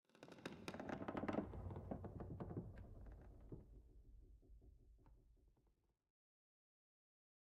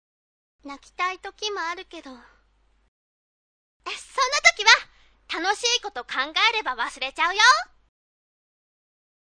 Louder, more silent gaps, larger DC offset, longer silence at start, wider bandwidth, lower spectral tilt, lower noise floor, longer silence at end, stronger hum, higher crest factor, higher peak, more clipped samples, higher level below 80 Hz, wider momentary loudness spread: second, -52 LUFS vs -21 LUFS; second, none vs 2.88-3.80 s; neither; second, 0.15 s vs 0.65 s; about the same, 10 kHz vs 10 kHz; first, -7 dB/octave vs 2 dB/octave; first, -82 dBFS vs -63 dBFS; about the same, 1.7 s vs 1.7 s; neither; about the same, 24 dB vs 26 dB; second, -30 dBFS vs 0 dBFS; neither; about the same, -64 dBFS vs -60 dBFS; about the same, 22 LU vs 23 LU